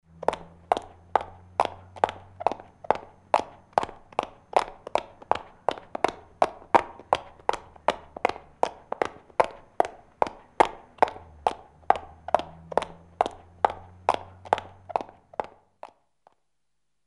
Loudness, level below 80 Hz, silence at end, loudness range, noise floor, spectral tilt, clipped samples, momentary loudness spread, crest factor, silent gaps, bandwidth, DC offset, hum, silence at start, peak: -29 LUFS; -58 dBFS; 1.6 s; 2 LU; -82 dBFS; -4 dB/octave; under 0.1%; 7 LU; 26 dB; none; 11.5 kHz; under 0.1%; none; 0.3 s; -2 dBFS